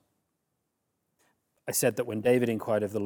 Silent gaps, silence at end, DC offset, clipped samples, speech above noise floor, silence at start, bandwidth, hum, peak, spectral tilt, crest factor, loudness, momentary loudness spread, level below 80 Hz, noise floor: none; 0 s; under 0.1%; under 0.1%; 53 dB; 1.65 s; 19.5 kHz; none; -12 dBFS; -4.5 dB/octave; 20 dB; -28 LUFS; 5 LU; -76 dBFS; -80 dBFS